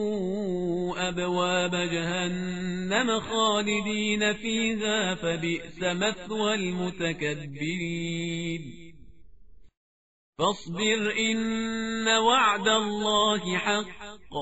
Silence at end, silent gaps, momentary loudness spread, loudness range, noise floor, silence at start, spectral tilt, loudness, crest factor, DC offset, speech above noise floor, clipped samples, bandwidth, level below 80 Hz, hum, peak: 0 s; 9.77-10.33 s; 8 LU; 8 LU; -54 dBFS; 0 s; -2.5 dB/octave; -27 LUFS; 18 dB; 0.3%; 27 dB; under 0.1%; 8 kHz; -56 dBFS; none; -10 dBFS